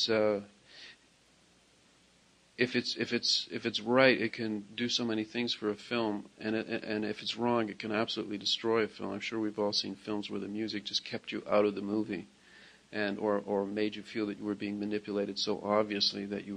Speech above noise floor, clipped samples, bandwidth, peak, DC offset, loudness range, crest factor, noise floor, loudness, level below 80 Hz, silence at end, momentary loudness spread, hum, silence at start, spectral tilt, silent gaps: 32 dB; under 0.1%; 10 kHz; -8 dBFS; under 0.1%; 5 LU; 26 dB; -65 dBFS; -32 LUFS; -74 dBFS; 0 s; 9 LU; none; 0 s; -4 dB/octave; none